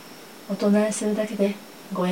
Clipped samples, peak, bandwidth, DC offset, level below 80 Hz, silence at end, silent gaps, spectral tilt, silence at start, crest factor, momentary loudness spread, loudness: under 0.1%; -10 dBFS; 16.5 kHz; 0.1%; -74 dBFS; 0 s; none; -5.5 dB/octave; 0 s; 14 dB; 18 LU; -24 LUFS